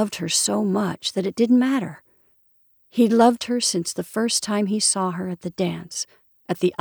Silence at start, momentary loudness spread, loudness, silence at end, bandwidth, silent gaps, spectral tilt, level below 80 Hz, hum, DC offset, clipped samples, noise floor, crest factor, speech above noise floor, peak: 0 s; 12 LU; -22 LUFS; 0.1 s; over 20 kHz; none; -4 dB/octave; -68 dBFS; none; under 0.1%; under 0.1%; -61 dBFS; 18 dB; 39 dB; -4 dBFS